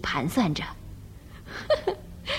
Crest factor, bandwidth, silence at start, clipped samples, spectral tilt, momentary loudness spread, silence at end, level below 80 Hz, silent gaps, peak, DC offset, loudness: 18 dB; 16 kHz; 0 s; under 0.1%; -5.5 dB/octave; 20 LU; 0 s; -46 dBFS; none; -12 dBFS; under 0.1%; -28 LUFS